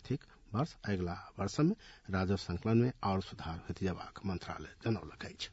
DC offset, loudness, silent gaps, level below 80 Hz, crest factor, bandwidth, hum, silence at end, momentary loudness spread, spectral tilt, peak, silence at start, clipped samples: under 0.1%; -37 LUFS; none; -60 dBFS; 18 dB; 7.6 kHz; none; 0 s; 11 LU; -6.5 dB/octave; -18 dBFS; 0 s; under 0.1%